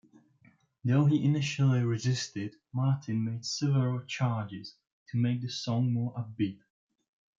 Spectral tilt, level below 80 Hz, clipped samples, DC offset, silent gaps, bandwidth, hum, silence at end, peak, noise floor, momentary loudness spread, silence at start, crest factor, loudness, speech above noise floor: -6 dB/octave; -72 dBFS; under 0.1%; under 0.1%; 4.92-5.06 s; 7.6 kHz; none; 0.85 s; -14 dBFS; -64 dBFS; 10 LU; 0.85 s; 16 dB; -30 LUFS; 35 dB